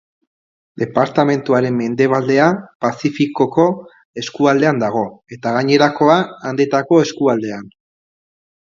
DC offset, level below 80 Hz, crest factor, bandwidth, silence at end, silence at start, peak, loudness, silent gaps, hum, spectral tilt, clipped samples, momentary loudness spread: under 0.1%; -60 dBFS; 16 dB; 7.6 kHz; 0.95 s; 0.75 s; 0 dBFS; -16 LUFS; 2.75-2.80 s, 4.05-4.14 s; none; -6 dB/octave; under 0.1%; 12 LU